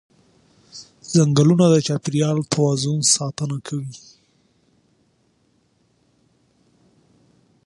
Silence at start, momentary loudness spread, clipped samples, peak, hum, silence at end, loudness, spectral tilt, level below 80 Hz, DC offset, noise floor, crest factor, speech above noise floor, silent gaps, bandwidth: 0.75 s; 24 LU; under 0.1%; -2 dBFS; none; 3.7 s; -19 LUFS; -5 dB/octave; -60 dBFS; under 0.1%; -63 dBFS; 20 dB; 45 dB; none; 11.5 kHz